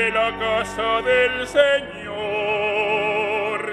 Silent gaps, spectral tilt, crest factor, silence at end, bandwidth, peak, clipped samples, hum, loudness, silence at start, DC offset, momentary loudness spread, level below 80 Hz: none; -3.5 dB/octave; 18 dB; 0 s; 12.5 kHz; -2 dBFS; under 0.1%; none; -20 LUFS; 0 s; under 0.1%; 6 LU; -48 dBFS